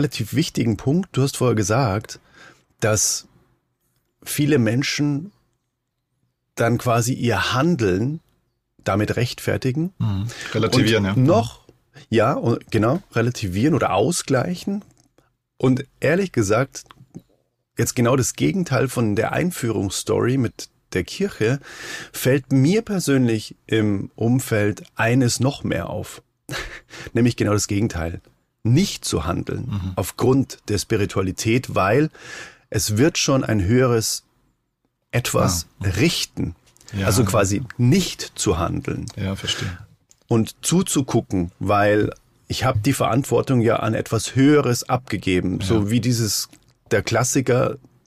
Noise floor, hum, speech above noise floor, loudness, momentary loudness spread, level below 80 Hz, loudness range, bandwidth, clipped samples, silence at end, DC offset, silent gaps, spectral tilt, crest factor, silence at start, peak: -76 dBFS; none; 56 dB; -21 LUFS; 10 LU; -46 dBFS; 3 LU; 15.5 kHz; under 0.1%; 0.3 s; under 0.1%; none; -5 dB/octave; 14 dB; 0 s; -8 dBFS